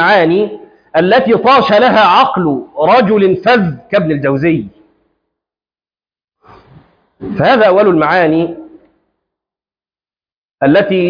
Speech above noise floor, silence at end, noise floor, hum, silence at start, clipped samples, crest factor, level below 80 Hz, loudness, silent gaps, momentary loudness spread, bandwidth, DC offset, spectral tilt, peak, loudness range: over 80 dB; 0 s; under -90 dBFS; none; 0 s; under 0.1%; 12 dB; -50 dBFS; -10 LUFS; 6.24-6.28 s, 10.37-10.49 s; 10 LU; 5.2 kHz; under 0.1%; -7.5 dB/octave; 0 dBFS; 9 LU